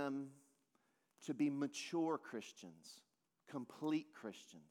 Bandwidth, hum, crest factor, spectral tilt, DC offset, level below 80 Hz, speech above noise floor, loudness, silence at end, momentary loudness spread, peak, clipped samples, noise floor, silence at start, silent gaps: 14 kHz; none; 18 dB; -5 dB/octave; under 0.1%; under -90 dBFS; 37 dB; -44 LUFS; 0.1 s; 18 LU; -28 dBFS; under 0.1%; -81 dBFS; 0 s; none